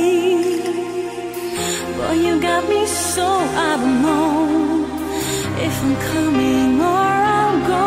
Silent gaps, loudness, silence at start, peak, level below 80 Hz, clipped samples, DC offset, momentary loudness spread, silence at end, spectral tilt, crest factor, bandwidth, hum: none; -18 LUFS; 0 s; -4 dBFS; -44 dBFS; under 0.1%; under 0.1%; 7 LU; 0 s; -4.5 dB/octave; 12 dB; 16 kHz; none